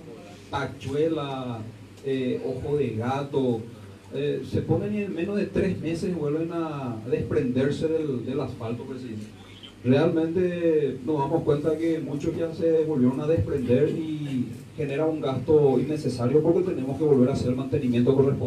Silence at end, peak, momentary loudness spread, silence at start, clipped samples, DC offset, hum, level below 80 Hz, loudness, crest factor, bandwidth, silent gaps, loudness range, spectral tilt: 0 s; -8 dBFS; 12 LU; 0 s; under 0.1%; under 0.1%; none; -52 dBFS; -26 LUFS; 18 dB; 12.5 kHz; none; 5 LU; -8 dB/octave